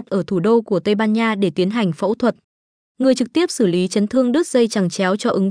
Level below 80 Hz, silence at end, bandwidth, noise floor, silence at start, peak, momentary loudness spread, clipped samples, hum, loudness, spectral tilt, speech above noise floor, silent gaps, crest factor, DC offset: -64 dBFS; 0 s; 10.5 kHz; under -90 dBFS; 0 s; -4 dBFS; 3 LU; under 0.1%; none; -18 LUFS; -5.5 dB/octave; over 73 dB; 2.44-2.95 s; 12 dB; under 0.1%